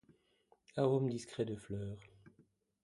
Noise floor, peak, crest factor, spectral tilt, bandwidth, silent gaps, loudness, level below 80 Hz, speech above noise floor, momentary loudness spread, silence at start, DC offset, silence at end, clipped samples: -73 dBFS; -20 dBFS; 22 dB; -7.5 dB/octave; 11 kHz; none; -39 LUFS; -68 dBFS; 36 dB; 14 LU; 0.75 s; under 0.1%; 0.55 s; under 0.1%